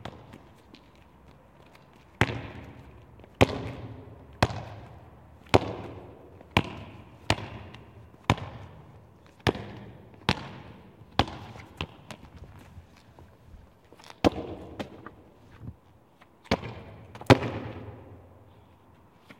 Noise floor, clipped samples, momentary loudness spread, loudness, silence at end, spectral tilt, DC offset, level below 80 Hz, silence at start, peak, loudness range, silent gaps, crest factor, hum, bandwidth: -58 dBFS; under 0.1%; 25 LU; -29 LUFS; 0.05 s; -5.5 dB/octave; under 0.1%; -50 dBFS; 0 s; 0 dBFS; 6 LU; none; 32 dB; none; 16.5 kHz